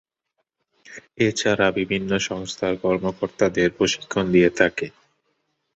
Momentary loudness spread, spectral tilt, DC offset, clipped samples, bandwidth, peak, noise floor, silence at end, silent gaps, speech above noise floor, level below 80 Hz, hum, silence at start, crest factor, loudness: 12 LU; -4.5 dB/octave; under 0.1%; under 0.1%; 8.2 kHz; -2 dBFS; -77 dBFS; 0.85 s; none; 55 dB; -52 dBFS; none; 0.9 s; 20 dB; -21 LUFS